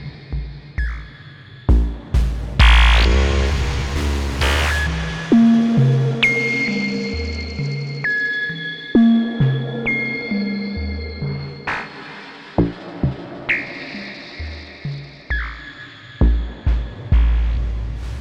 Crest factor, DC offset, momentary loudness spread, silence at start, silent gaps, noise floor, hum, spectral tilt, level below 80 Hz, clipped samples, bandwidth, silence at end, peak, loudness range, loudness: 16 dB; under 0.1%; 17 LU; 0 s; none; -39 dBFS; none; -6 dB/octave; -22 dBFS; under 0.1%; 11 kHz; 0 s; -2 dBFS; 8 LU; -19 LUFS